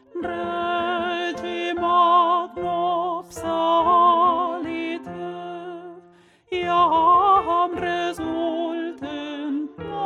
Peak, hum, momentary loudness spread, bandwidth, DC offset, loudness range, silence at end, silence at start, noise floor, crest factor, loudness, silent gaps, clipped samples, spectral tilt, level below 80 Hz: -8 dBFS; none; 15 LU; 12.5 kHz; under 0.1%; 3 LU; 0 s; 0.15 s; -53 dBFS; 14 dB; -21 LUFS; none; under 0.1%; -5 dB/octave; -58 dBFS